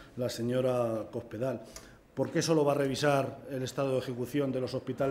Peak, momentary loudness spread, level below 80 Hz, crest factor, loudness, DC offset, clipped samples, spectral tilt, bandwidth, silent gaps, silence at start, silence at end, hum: -14 dBFS; 11 LU; -64 dBFS; 18 dB; -32 LUFS; under 0.1%; under 0.1%; -5.5 dB/octave; 16 kHz; none; 0 s; 0 s; none